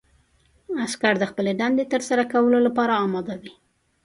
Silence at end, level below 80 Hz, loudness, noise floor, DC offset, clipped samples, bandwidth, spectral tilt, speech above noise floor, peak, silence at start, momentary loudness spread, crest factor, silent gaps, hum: 0.55 s; -64 dBFS; -22 LUFS; -61 dBFS; under 0.1%; under 0.1%; 11.5 kHz; -5 dB/octave; 40 dB; -4 dBFS; 0.7 s; 11 LU; 18 dB; none; none